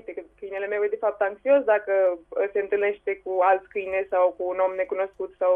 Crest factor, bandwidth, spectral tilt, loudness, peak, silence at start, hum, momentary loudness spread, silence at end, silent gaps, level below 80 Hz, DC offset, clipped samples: 16 dB; 3.6 kHz; -7 dB/octave; -24 LUFS; -8 dBFS; 0.1 s; none; 9 LU; 0 s; none; -64 dBFS; under 0.1%; under 0.1%